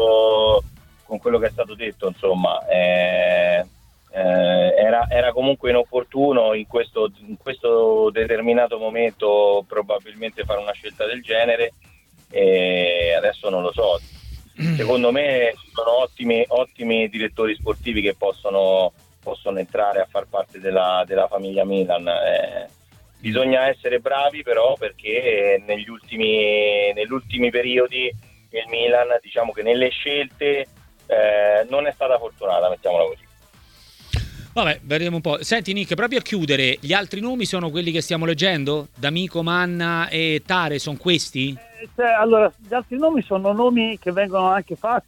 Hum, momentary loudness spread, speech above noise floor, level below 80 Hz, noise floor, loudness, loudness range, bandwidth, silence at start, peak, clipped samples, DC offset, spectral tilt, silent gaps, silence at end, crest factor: none; 9 LU; 31 dB; -46 dBFS; -51 dBFS; -20 LUFS; 3 LU; 16 kHz; 0 s; -2 dBFS; under 0.1%; under 0.1%; -5 dB/octave; none; 0.05 s; 18 dB